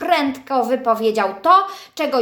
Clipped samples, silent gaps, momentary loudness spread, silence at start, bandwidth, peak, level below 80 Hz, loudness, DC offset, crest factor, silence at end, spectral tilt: under 0.1%; none; 8 LU; 0 s; 18 kHz; 0 dBFS; -66 dBFS; -18 LUFS; under 0.1%; 16 dB; 0 s; -4 dB/octave